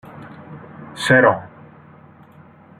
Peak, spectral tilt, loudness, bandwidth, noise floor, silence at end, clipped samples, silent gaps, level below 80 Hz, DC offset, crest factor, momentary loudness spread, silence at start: -2 dBFS; -5.5 dB/octave; -16 LUFS; 14.5 kHz; -46 dBFS; 1.35 s; under 0.1%; none; -60 dBFS; under 0.1%; 20 dB; 25 LU; 0.15 s